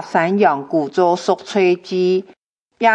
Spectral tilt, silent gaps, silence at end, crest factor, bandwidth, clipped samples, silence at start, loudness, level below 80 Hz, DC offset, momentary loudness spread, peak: -6 dB/octave; 2.37-2.70 s; 0 s; 16 dB; 8.6 kHz; under 0.1%; 0 s; -17 LUFS; -72 dBFS; under 0.1%; 4 LU; 0 dBFS